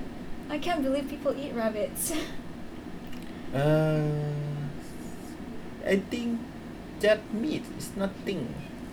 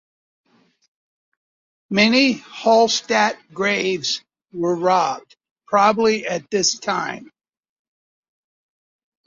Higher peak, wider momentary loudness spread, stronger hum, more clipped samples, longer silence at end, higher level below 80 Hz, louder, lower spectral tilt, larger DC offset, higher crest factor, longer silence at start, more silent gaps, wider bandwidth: second, -12 dBFS vs -2 dBFS; first, 16 LU vs 10 LU; neither; neither; second, 0 s vs 2 s; first, -50 dBFS vs -66 dBFS; second, -31 LUFS vs -19 LUFS; first, -5.5 dB/octave vs -3 dB/octave; neither; about the same, 18 dB vs 18 dB; second, 0 s vs 1.9 s; second, none vs 5.51-5.56 s; first, over 20 kHz vs 7.6 kHz